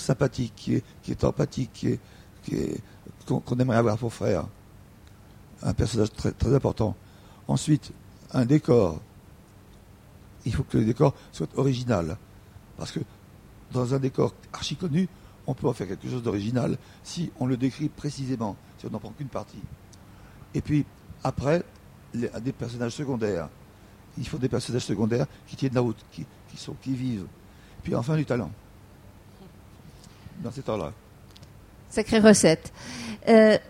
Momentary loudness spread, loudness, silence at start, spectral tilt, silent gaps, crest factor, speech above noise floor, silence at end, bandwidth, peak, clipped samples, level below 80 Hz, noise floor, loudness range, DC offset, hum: 17 LU; -27 LUFS; 0 s; -6 dB/octave; none; 26 dB; 25 dB; 0.05 s; 15.5 kHz; 0 dBFS; under 0.1%; -48 dBFS; -51 dBFS; 7 LU; under 0.1%; none